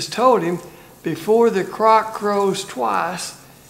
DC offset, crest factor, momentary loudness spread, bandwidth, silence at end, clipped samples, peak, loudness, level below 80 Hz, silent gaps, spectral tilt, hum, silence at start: under 0.1%; 18 dB; 13 LU; 16 kHz; 0.3 s; under 0.1%; -2 dBFS; -18 LUFS; -60 dBFS; none; -4.5 dB/octave; none; 0 s